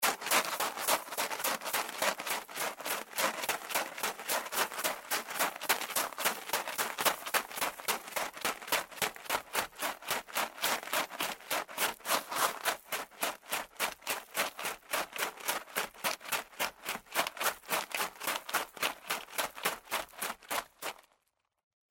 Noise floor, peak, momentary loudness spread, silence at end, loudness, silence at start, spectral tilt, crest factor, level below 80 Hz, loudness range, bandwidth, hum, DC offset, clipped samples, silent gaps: -79 dBFS; -12 dBFS; 7 LU; 0.95 s; -34 LUFS; 0 s; 0 dB/octave; 24 dB; -72 dBFS; 3 LU; 17 kHz; none; under 0.1%; under 0.1%; none